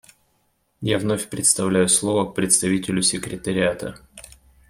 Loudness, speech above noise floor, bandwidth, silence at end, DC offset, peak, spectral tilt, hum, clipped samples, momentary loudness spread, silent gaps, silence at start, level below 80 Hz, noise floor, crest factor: -20 LUFS; 46 dB; 16 kHz; 0.5 s; under 0.1%; -2 dBFS; -3.5 dB/octave; none; under 0.1%; 10 LU; none; 0.8 s; -52 dBFS; -67 dBFS; 22 dB